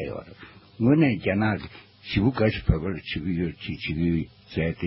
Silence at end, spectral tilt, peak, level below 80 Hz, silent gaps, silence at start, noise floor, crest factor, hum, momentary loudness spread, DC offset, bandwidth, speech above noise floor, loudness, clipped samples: 0 s; -11.5 dB/octave; -6 dBFS; -38 dBFS; none; 0 s; -48 dBFS; 20 dB; none; 14 LU; under 0.1%; 5.8 kHz; 23 dB; -25 LUFS; under 0.1%